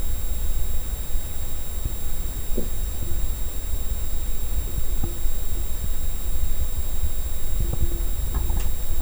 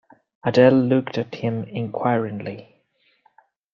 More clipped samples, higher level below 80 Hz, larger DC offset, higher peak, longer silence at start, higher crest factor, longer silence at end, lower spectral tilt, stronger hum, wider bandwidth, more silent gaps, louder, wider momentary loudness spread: neither; first, -24 dBFS vs -64 dBFS; neither; second, -8 dBFS vs -2 dBFS; second, 0 s vs 0.45 s; second, 12 dB vs 20 dB; second, 0 s vs 1.1 s; second, -4.5 dB/octave vs -8 dB/octave; neither; first, over 20 kHz vs 7.2 kHz; neither; second, -28 LUFS vs -21 LUFS; second, 3 LU vs 16 LU